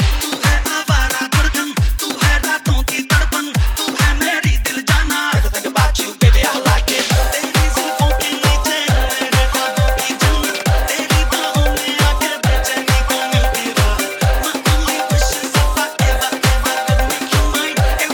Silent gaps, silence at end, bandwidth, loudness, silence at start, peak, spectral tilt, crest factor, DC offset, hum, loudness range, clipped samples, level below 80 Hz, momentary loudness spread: none; 0 s; over 20 kHz; -16 LUFS; 0 s; 0 dBFS; -3.5 dB/octave; 14 dB; under 0.1%; none; 1 LU; under 0.1%; -18 dBFS; 2 LU